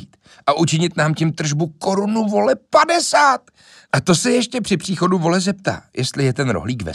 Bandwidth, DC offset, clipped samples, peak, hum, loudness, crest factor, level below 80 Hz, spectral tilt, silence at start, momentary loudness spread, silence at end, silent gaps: 13 kHz; under 0.1%; under 0.1%; -2 dBFS; none; -18 LUFS; 16 dB; -52 dBFS; -4.5 dB/octave; 0 s; 8 LU; 0 s; none